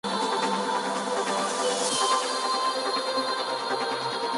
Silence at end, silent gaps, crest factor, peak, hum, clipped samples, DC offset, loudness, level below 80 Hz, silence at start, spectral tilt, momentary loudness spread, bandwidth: 0 s; none; 14 dB; -12 dBFS; none; under 0.1%; under 0.1%; -26 LUFS; -76 dBFS; 0.05 s; -1.5 dB/octave; 4 LU; 11.5 kHz